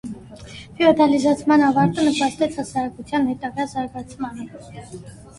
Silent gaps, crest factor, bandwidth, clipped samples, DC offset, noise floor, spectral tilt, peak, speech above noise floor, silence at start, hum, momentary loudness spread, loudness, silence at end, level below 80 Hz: none; 18 dB; 11.5 kHz; under 0.1%; under 0.1%; -39 dBFS; -5.5 dB/octave; -2 dBFS; 19 dB; 0.05 s; none; 22 LU; -20 LUFS; 0.15 s; -52 dBFS